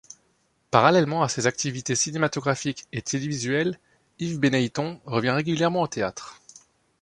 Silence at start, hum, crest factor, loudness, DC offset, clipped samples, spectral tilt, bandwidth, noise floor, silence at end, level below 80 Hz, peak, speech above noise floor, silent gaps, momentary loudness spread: 0.7 s; none; 24 dB; -24 LUFS; under 0.1%; under 0.1%; -4.5 dB/octave; 11.5 kHz; -68 dBFS; 0.7 s; -62 dBFS; -2 dBFS; 44 dB; none; 11 LU